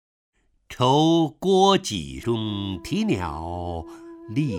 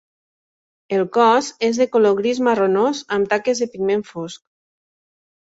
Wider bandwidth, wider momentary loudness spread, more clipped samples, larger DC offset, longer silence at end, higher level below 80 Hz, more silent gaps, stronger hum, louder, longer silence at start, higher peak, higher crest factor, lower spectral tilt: first, 15 kHz vs 8 kHz; first, 16 LU vs 8 LU; neither; neither; second, 0 s vs 1.25 s; first, -48 dBFS vs -64 dBFS; neither; neither; second, -23 LUFS vs -18 LUFS; second, 0.7 s vs 0.9 s; about the same, -6 dBFS vs -4 dBFS; about the same, 18 dB vs 16 dB; about the same, -5.5 dB/octave vs -4.5 dB/octave